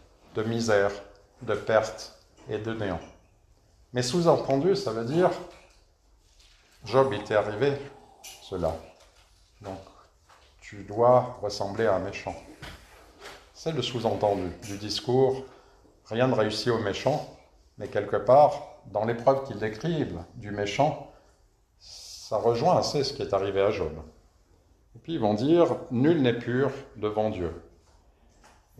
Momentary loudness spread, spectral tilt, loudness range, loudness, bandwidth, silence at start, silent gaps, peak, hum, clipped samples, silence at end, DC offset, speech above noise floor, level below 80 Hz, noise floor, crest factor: 21 LU; -6 dB/octave; 5 LU; -27 LUFS; 13.5 kHz; 0.35 s; none; -8 dBFS; none; under 0.1%; 1.2 s; under 0.1%; 37 dB; -56 dBFS; -63 dBFS; 20 dB